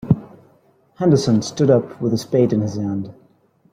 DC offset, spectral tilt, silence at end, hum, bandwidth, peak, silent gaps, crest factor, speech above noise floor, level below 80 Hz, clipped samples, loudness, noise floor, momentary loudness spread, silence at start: under 0.1%; -7 dB/octave; 0.6 s; none; 14.5 kHz; -2 dBFS; none; 18 dB; 39 dB; -52 dBFS; under 0.1%; -19 LUFS; -56 dBFS; 9 LU; 0.05 s